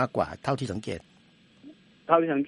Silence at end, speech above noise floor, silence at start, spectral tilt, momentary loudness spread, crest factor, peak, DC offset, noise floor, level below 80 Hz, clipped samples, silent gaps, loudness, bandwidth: 0 s; 32 dB; 0 s; -7 dB/octave; 15 LU; 24 dB; -6 dBFS; under 0.1%; -59 dBFS; -60 dBFS; under 0.1%; none; -28 LUFS; 11.5 kHz